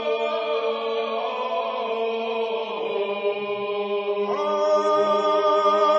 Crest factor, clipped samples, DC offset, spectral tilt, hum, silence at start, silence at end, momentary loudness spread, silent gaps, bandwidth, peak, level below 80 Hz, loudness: 14 dB; under 0.1%; under 0.1%; -4 dB/octave; none; 0 s; 0 s; 7 LU; none; 8 kHz; -8 dBFS; under -90 dBFS; -24 LUFS